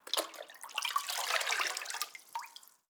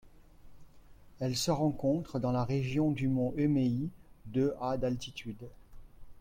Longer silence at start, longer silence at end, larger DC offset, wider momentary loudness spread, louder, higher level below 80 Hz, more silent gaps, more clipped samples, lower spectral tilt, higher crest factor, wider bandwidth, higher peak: about the same, 0.05 s vs 0.05 s; first, 0.25 s vs 0 s; neither; about the same, 13 LU vs 12 LU; second, -35 LUFS vs -32 LUFS; second, under -90 dBFS vs -54 dBFS; neither; neither; second, 3.5 dB/octave vs -6.5 dB/octave; first, 24 dB vs 16 dB; first, over 20 kHz vs 16.5 kHz; first, -14 dBFS vs -18 dBFS